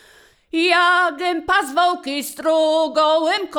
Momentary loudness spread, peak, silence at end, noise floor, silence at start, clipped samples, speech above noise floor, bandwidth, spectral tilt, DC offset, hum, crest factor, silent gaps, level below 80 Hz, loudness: 9 LU; -4 dBFS; 0 s; -51 dBFS; 0.55 s; under 0.1%; 33 dB; 19.5 kHz; -1.5 dB/octave; under 0.1%; none; 16 dB; none; -56 dBFS; -18 LUFS